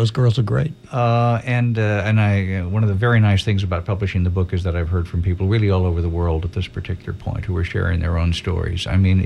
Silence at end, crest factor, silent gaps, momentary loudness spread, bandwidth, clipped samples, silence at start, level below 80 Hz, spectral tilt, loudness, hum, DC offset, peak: 0 s; 12 dB; none; 7 LU; 9.2 kHz; under 0.1%; 0 s; -32 dBFS; -7.5 dB/octave; -20 LUFS; none; under 0.1%; -6 dBFS